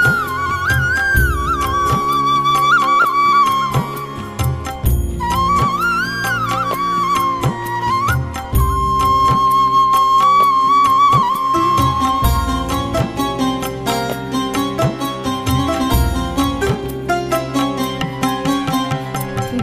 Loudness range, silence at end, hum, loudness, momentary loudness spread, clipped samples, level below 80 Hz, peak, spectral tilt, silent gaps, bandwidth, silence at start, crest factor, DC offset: 6 LU; 0 s; none; -16 LUFS; 9 LU; under 0.1%; -28 dBFS; 0 dBFS; -5 dB/octave; none; 15.5 kHz; 0 s; 16 dB; under 0.1%